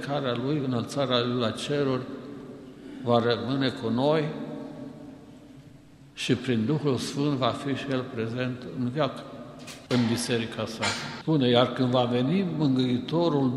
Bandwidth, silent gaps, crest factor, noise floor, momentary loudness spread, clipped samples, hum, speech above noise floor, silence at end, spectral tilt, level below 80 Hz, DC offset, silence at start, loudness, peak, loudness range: 12.5 kHz; none; 20 dB; -50 dBFS; 17 LU; under 0.1%; none; 24 dB; 0 s; -6 dB/octave; -62 dBFS; under 0.1%; 0 s; -27 LUFS; -6 dBFS; 4 LU